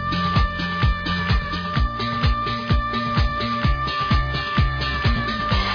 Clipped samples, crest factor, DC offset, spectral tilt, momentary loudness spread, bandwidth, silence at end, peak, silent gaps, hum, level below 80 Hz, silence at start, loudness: under 0.1%; 14 dB; under 0.1%; -6.5 dB/octave; 2 LU; 5.4 kHz; 0 s; -6 dBFS; none; none; -26 dBFS; 0 s; -22 LUFS